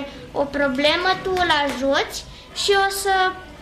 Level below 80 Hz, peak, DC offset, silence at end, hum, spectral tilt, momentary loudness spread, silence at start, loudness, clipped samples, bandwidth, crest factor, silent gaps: -44 dBFS; -6 dBFS; under 0.1%; 0 s; none; -2.5 dB/octave; 10 LU; 0 s; -20 LUFS; under 0.1%; 15.5 kHz; 14 dB; none